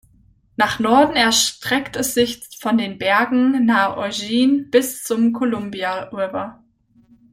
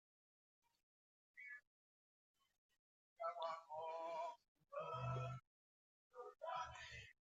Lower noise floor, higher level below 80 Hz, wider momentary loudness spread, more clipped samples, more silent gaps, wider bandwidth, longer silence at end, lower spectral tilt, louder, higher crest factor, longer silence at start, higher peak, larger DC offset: second, -55 dBFS vs under -90 dBFS; first, -54 dBFS vs -78 dBFS; second, 10 LU vs 13 LU; neither; second, none vs 1.67-2.34 s, 2.58-2.69 s, 2.79-3.16 s, 4.48-4.55 s, 5.47-6.11 s; first, 16.5 kHz vs 8 kHz; first, 0.8 s vs 0.25 s; second, -3 dB/octave vs -5.5 dB/octave; first, -18 LUFS vs -51 LUFS; about the same, 18 dB vs 20 dB; second, 0.6 s vs 1.35 s; first, -2 dBFS vs -32 dBFS; neither